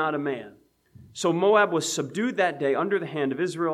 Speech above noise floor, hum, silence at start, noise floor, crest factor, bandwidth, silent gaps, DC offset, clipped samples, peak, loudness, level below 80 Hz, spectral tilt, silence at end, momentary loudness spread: 28 dB; none; 0 s; -53 dBFS; 18 dB; 14.5 kHz; none; under 0.1%; under 0.1%; -8 dBFS; -25 LUFS; -72 dBFS; -4.5 dB/octave; 0 s; 10 LU